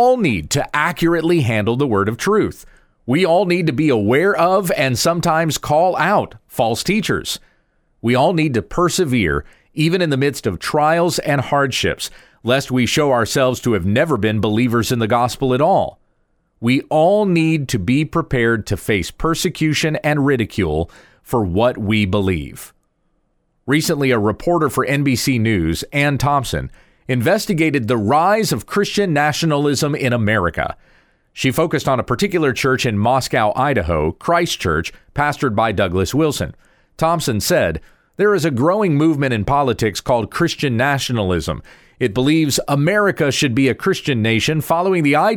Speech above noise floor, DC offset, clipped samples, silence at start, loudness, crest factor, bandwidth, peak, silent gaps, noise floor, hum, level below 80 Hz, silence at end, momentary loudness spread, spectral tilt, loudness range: 47 dB; under 0.1%; under 0.1%; 0 s; -17 LUFS; 16 dB; 20 kHz; -2 dBFS; none; -64 dBFS; none; -40 dBFS; 0 s; 6 LU; -5 dB/octave; 2 LU